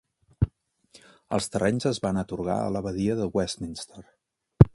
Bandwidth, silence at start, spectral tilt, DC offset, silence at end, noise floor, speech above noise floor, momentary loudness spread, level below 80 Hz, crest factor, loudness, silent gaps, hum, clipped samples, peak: 11.5 kHz; 0.4 s; -6.5 dB/octave; under 0.1%; 0.05 s; -58 dBFS; 31 dB; 8 LU; -42 dBFS; 26 dB; -28 LUFS; none; none; under 0.1%; 0 dBFS